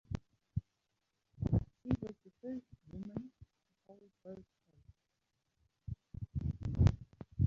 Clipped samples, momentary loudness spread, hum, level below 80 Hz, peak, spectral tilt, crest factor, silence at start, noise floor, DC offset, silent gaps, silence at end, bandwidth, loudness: under 0.1%; 21 LU; none; -48 dBFS; -16 dBFS; -10 dB/octave; 24 dB; 0.1 s; -85 dBFS; under 0.1%; none; 0 s; 7.2 kHz; -40 LUFS